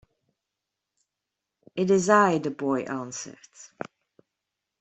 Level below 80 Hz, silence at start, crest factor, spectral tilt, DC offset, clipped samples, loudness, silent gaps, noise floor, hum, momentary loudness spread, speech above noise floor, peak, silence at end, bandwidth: -70 dBFS; 1.75 s; 22 dB; -5 dB/octave; under 0.1%; under 0.1%; -24 LUFS; none; -86 dBFS; none; 21 LU; 61 dB; -6 dBFS; 1.15 s; 8.4 kHz